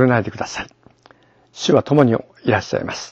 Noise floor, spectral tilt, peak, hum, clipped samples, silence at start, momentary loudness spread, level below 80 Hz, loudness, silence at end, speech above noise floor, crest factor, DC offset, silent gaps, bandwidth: -52 dBFS; -6 dB/octave; 0 dBFS; none; under 0.1%; 0 s; 12 LU; -54 dBFS; -19 LUFS; 0 s; 34 dB; 18 dB; under 0.1%; none; 8.2 kHz